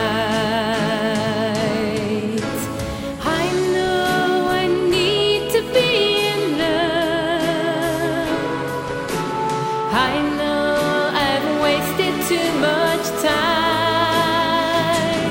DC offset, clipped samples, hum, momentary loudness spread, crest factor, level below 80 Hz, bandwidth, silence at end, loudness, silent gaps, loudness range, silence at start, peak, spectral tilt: under 0.1%; under 0.1%; none; 5 LU; 14 dB; -44 dBFS; 16.5 kHz; 0 s; -19 LUFS; none; 3 LU; 0 s; -4 dBFS; -4.5 dB/octave